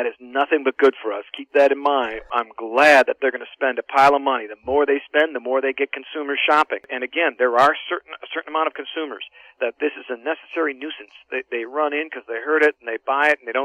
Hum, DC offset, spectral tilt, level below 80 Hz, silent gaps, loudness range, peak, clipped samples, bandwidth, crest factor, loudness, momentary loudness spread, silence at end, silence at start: none; under 0.1%; -3.5 dB/octave; -60 dBFS; none; 8 LU; -4 dBFS; under 0.1%; 14 kHz; 16 dB; -20 LUFS; 13 LU; 0 s; 0 s